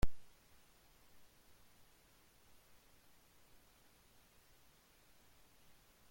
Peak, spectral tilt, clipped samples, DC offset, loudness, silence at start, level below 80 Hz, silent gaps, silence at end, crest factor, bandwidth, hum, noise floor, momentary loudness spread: -20 dBFS; -5 dB/octave; under 0.1%; under 0.1%; -63 LUFS; 0.05 s; -54 dBFS; none; 4.85 s; 24 dB; 16.5 kHz; none; -68 dBFS; 0 LU